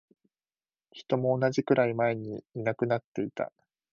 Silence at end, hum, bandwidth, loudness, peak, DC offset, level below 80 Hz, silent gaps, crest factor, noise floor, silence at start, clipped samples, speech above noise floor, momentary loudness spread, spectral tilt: 0.5 s; none; 7.4 kHz; -29 LUFS; -12 dBFS; under 0.1%; -72 dBFS; 3.04-3.15 s; 20 dB; under -90 dBFS; 0.95 s; under 0.1%; over 61 dB; 12 LU; -7.5 dB/octave